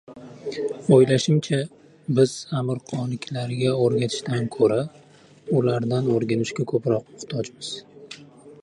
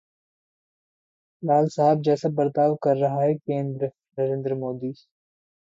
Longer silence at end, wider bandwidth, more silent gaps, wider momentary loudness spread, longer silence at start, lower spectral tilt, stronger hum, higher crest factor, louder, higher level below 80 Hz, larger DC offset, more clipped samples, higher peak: second, 0.1 s vs 0.85 s; first, 11 kHz vs 7.8 kHz; neither; first, 18 LU vs 10 LU; second, 0.1 s vs 1.4 s; second, -6.5 dB/octave vs -8.5 dB/octave; neither; about the same, 20 dB vs 16 dB; about the same, -23 LUFS vs -24 LUFS; first, -64 dBFS vs -70 dBFS; neither; neither; first, -4 dBFS vs -8 dBFS